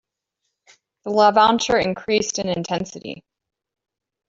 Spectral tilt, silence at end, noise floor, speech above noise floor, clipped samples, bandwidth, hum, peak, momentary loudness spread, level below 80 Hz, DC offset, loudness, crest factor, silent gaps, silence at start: -3.5 dB/octave; 1.1 s; -78 dBFS; 59 dB; under 0.1%; 8 kHz; none; -2 dBFS; 21 LU; -56 dBFS; under 0.1%; -19 LUFS; 20 dB; none; 1.05 s